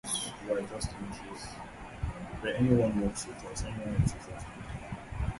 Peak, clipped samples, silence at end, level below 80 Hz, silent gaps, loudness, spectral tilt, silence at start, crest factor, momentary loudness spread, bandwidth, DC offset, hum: -12 dBFS; under 0.1%; 0 s; -44 dBFS; none; -34 LUFS; -5.5 dB/octave; 0.05 s; 20 dB; 16 LU; 12 kHz; under 0.1%; none